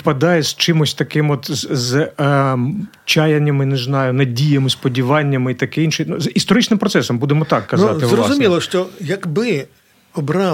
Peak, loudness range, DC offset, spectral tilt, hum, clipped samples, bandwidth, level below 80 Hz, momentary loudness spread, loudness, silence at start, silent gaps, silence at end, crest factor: 0 dBFS; 1 LU; under 0.1%; -5.5 dB/octave; none; under 0.1%; 16.5 kHz; -56 dBFS; 6 LU; -16 LUFS; 0.05 s; none; 0 s; 14 dB